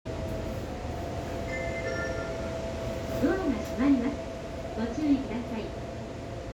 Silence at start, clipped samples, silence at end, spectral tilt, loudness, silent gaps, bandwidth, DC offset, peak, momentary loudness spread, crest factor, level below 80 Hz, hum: 0.05 s; under 0.1%; 0 s; -6.5 dB/octave; -32 LUFS; none; 19.5 kHz; under 0.1%; -14 dBFS; 10 LU; 18 dB; -44 dBFS; none